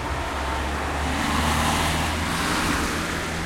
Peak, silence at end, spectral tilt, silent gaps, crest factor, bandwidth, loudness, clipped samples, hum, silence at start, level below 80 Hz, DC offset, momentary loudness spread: -10 dBFS; 0 s; -4 dB/octave; none; 14 dB; 16.5 kHz; -24 LUFS; under 0.1%; none; 0 s; -34 dBFS; under 0.1%; 5 LU